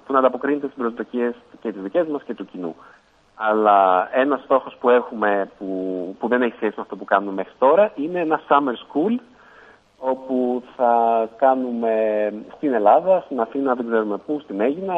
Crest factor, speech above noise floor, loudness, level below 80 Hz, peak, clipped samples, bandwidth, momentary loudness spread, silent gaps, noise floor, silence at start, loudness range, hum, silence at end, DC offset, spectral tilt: 18 dB; 29 dB; -20 LUFS; -68 dBFS; -2 dBFS; under 0.1%; 5 kHz; 12 LU; none; -49 dBFS; 0.1 s; 3 LU; none; 0 s; under 0.1%; -8 dB/octave